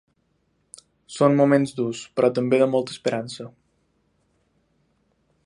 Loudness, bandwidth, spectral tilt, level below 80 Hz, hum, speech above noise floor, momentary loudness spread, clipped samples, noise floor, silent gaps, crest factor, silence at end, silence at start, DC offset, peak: -21 LUFS; 11.5 kHz; -6.5 dB/octave; -70 dBFS; none; 48 dB; 18 LU; under 0.1%; -69 dBFS; none; 22 dB; 1.95 s; 1.1 s; under 0.1%; -4 dBFS